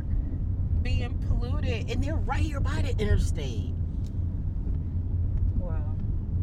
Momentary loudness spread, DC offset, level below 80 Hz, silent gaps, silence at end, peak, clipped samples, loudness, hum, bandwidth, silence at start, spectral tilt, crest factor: 5 LU; under 0.1%; -30 dBFS; none; 0 s; -12 dBFS; under 0.1%; -30 LUFS; none; 9.6 kHz; 0 s; -7 dB/octave; 14 dB